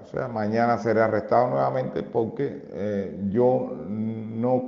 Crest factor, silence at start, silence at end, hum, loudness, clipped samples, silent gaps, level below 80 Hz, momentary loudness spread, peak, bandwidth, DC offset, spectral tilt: 18 dB; 0 s; 0 s; none; -25 LUFS; under 0.1%; none; -62 dBFS; 9 LU; -6 dBFS; 7 kHz; under 0.1%; -8.5 dB/octave